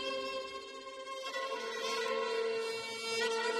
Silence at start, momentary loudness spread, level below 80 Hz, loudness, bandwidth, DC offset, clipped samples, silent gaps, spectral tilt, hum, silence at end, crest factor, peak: 0 s; 10 LU; -78 dBFS; -37 LUFS; 13 kHz; under 0.1%; under 0.1%; none; -0.5 dB/octave; none; 0 s; 14 dB; -22 dBFS